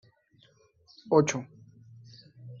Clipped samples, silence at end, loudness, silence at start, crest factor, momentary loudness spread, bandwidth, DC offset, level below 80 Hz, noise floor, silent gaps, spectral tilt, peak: under 0.1%; 0.05 s; -27 LUFS; 1.05 s; 24 dB; 27 LU; 7.2 kHz; under 0.1%; -72 dBFS; -64 dBFS; none; -6 dB/octave; -8 dBFS